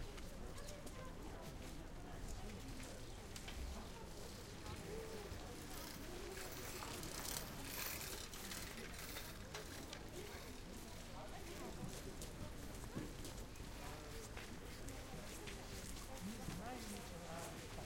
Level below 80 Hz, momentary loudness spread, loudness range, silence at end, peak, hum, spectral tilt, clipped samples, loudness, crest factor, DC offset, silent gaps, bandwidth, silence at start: -56 dBFS; 7 LU; 5 LU; 0 s; -28 dBFS; none; -3.5 dB/octave; under 0.1%; -51 LUFS; 22 dB; under 0.1%; none; 16.5 kHz; 0 s